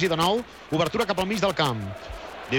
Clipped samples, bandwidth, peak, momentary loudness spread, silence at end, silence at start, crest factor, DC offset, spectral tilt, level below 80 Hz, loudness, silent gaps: under 0.1%; 19.5 kHz; -10 dBFS; 14 LU; 0 s; 0 s; 16 dB; under 0.1%; -5 dB/octave; -48 dBFS; -25 LUFS; none